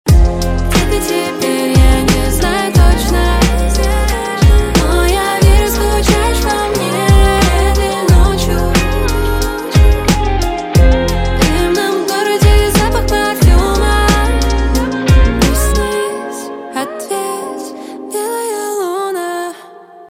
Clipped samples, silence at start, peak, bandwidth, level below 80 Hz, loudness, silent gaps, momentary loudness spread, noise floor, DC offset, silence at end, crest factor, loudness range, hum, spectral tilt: under 0.1%; 0.05 s; 0 dBFS; 16.5 kHz; -14 dBFS; -13 LUFS; none; 9 LU; -36 dBFS; under 0.1%; 0.05 s; 12 dB; 6 LU; none; -5 dB/octave